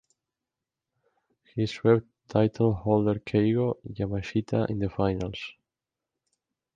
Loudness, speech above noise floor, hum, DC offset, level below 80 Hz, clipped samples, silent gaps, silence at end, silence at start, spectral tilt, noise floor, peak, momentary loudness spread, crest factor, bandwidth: -27 LUFS; 62 dB; none; under 0.1%; -52 dBFS; under 0.1%; none; 1.25 s; 1.55 s; -8.5 dB/octave; -88 dBFS; -8 dBFS; 9 LU; 20 dB; 7.4 kHz